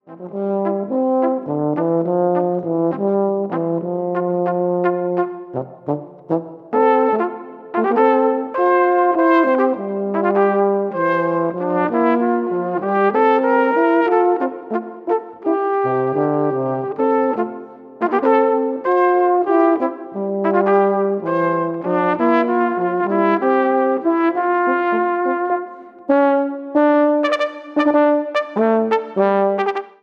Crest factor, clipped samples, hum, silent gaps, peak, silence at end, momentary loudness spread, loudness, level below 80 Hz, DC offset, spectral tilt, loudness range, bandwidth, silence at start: 16 dB; under 0.1%; none; none; -2 dBFS; 0.15 s; 8 LU; -18 LUFS; -74 dBFS; under 0.1%; -8.5 dB/octave; 3 LU; 6.2 kHz; 0.1 s